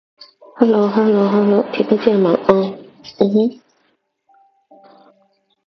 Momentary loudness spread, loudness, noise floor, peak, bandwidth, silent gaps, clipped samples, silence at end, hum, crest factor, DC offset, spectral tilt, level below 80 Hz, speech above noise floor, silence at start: 6 LU; -15 LUFS; -64 dBFS; 0 dBFS; 6.2 kHz; none; under 0.1%; 2.15 s; none; 18 dB; under 0.1%; -8.5 dB/octave; -60 dBFS; 50 dB; 0.55 s